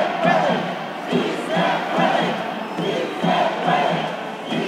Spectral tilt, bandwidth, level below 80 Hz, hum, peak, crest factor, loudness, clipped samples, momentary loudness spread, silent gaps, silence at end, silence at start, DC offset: -5.5 dB/octave; 15.5 kHz; -66 dBFS; none; -4 dBFS; 16 dB; -21 LUFS; under 0.1%; 8 LU; none; 0 s; 0 s; under 0.1%